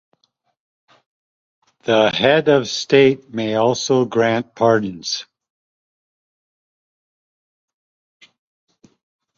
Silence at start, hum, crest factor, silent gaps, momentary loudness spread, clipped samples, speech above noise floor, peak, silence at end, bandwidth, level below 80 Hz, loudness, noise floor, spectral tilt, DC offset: 1.85 s; none; 20 dB; none; 10 LU; under 0.1%; 49 dB; -2 dBFS; 4.15 s; 7.6 kHz; -62 dBFS; -17 LUFS; -66 dBFS; -4.5 dB/octave; under 0.1%